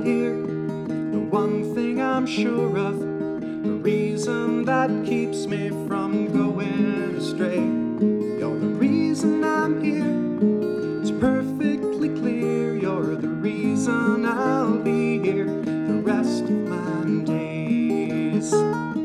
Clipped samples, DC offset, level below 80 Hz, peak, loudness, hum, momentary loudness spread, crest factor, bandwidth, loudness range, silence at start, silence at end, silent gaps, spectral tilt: under 0.1%; under 0.1%; -60 dBFS; -8 dBFS; -23 LUFS; none; 5 LU; 14 dB; 12.5 kHz; 2 LU; 0 s; 0 s; none; -6.5 dB/octave